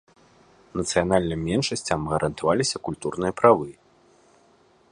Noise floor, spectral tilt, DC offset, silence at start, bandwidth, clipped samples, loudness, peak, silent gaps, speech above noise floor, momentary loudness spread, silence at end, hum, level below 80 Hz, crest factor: -59 dBFS; -4.5 dB/octave; under 0.1%; 0.75 s; 11.5 kHz; under 0.1%; -24 LUFS; -2 dBFS; none; 36 dB; 11 LU; 1.2 s; none; -48 dBFS; 24 dB